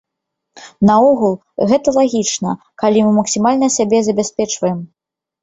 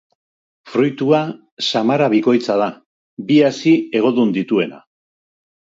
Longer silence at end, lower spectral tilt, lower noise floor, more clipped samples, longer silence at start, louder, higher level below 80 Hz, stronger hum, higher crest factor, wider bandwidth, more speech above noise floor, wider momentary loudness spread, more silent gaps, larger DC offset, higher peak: second, 0.55 s vs 1 s; about the same, -5 dB/octave vs -6 dB/octave; second, -78 dBFS vs under -90 dBFS; neither; about the same, 0.55 s vs 0.65 s; about the same, -15 LUFS vs -17 LUFS; first, -54 dBFS vs -68 dBFS; neither; about the same, 14 dB vs 16 dB; about the same, 8.2 kHz vs 7.8 kHz; second, 64 dB vs over 74 dB; about the same, 8 LU vs 9 LU; second, none vs 1.52-1.57 s, 2.86-3.17 s; neither; about the same, -2 dBFS vs -2 dBFS